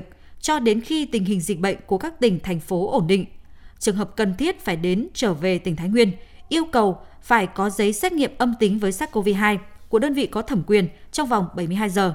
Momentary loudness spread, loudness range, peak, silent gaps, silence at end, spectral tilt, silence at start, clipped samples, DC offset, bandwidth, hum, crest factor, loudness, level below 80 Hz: 6 LU; 2 LU; -4 dBFS; none; 0 s; -5 dB/octave; 0 s; under 0.1%; under 0.1%; 16.5 kHz; none; 18 dB; -22 LUFS; -46 dBFS